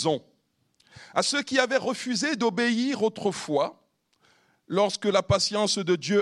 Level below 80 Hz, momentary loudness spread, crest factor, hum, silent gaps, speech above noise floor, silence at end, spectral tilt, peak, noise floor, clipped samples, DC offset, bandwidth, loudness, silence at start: -58 dBFS; 6 LU; 20 dB; none; none; 45 dB; 0 s; -4 dB/octave; -6 dBFS; -70 dBFS; under 0.1%; under 0.1%; 12.5 kHz; -25 LUFS; 0 s